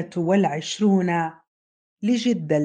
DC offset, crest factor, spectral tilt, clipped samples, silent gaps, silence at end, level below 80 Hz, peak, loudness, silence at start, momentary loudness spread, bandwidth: under 0.1%; 16 dB; -6 dB/octave; under 0.1%; 1.48-1.96 s; 0 s; -70 dBFS; -8 dBFS; -22 LUFS; 0 s; 6 LU; 9.2 kHz